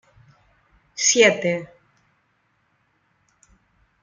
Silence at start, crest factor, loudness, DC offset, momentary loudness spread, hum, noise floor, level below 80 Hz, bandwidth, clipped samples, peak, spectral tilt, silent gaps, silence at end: 0.95 s; 22 dB; -18 LUFS; under 0.1%; 24 LU; none; -67 dBFS; -68 dBFS; 10 kHz; under 0.1%; -4 dBFS; -2 dB/octave; none; 2.4 s